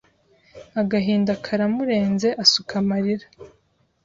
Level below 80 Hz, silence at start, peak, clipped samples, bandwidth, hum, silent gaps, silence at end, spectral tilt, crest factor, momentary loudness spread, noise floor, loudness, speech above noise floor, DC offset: -58 dBFS; 0.55 s; -2 dBFS; under 0.1%; 7.6 kHz; none; none; 0.55 s; -4.5 dB/octave; 20 dB; 9 LU; -59 dBFS; -21 LUFS; 38 dB; under 0.1%